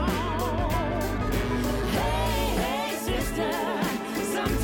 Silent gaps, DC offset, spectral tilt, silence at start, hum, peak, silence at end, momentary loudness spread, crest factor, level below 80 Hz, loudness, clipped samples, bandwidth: none; under 0.1%; -5 dB/octave; 0 s; none; -12 dBFS; 0 s; 2 LU; 14 dB; -34 dBFS; -27 LUFS; under 0.1%; 19.5 kHz